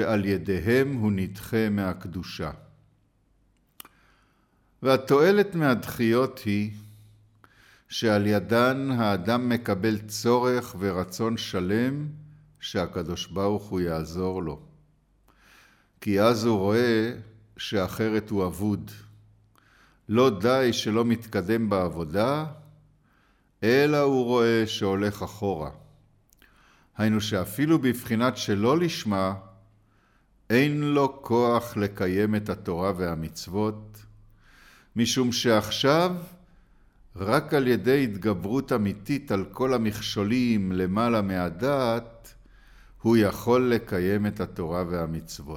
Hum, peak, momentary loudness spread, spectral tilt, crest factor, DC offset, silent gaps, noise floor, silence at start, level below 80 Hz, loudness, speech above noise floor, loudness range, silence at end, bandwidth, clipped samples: none; -6 dBFS; 10 LU; -6 dB/octave; 20 dB; under 0.1%; none; -65 dBFS; 0 s; -54 dBFS; -25 LUFS; 41 dB; 4 LU; 0 s; 17.5 kHz; under 0.1%